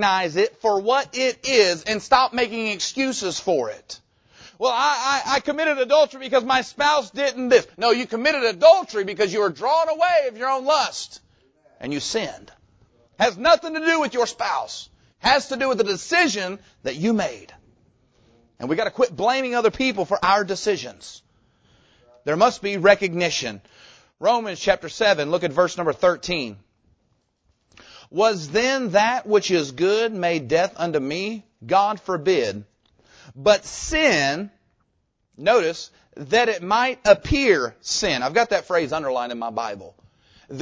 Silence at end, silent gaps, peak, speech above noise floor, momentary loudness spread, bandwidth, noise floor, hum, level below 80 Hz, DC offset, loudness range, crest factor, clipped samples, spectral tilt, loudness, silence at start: 0 s; none; -2 dBFS; 50 dB; 12 LU; 8 kHz; -70 dBFS; none; -50 dBFS; under 0.1%; 5 LU; 20 dB; under 0.1%; -3.5 dB/octave; -21 LUFS; 0 s